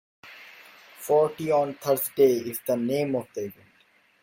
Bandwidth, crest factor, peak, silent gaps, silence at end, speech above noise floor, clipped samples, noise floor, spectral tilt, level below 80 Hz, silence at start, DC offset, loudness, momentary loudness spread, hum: 17 kHz; 18 dB; -8 dBFS; none; 0.7 s; 38 dB; under 0.1%; -62 dBFS; -5.5 dB/octave; -72 dBFS; 0.25 s; under 0.1%; -25 LUFS; 23 LU; none